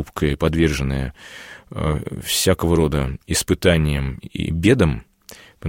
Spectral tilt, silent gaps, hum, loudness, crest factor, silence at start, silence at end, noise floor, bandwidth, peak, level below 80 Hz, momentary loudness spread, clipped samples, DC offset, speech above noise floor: -5 dB/octave; none; none; -20 LUFS; 18 dB; 0 s; 0 s; -45 dBFS; 16.5 kHz; -2 dBFS; -32 dBFS; 14 LU; under 0.1%; under 0.1%; 25 dB